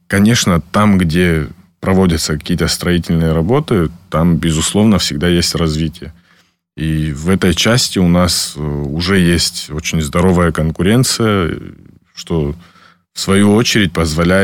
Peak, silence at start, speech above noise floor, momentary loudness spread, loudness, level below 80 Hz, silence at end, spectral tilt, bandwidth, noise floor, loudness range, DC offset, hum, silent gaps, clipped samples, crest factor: -2 dBFS; 0.1 s; 41 dB; 9 LU; -13 LUFS; -30 dBFS; 0 s; -5 dB/octave; 17.5 kHz; -54 dBFS; 2 LU; under 0.1%; none; none; under 0.1%; 12 dB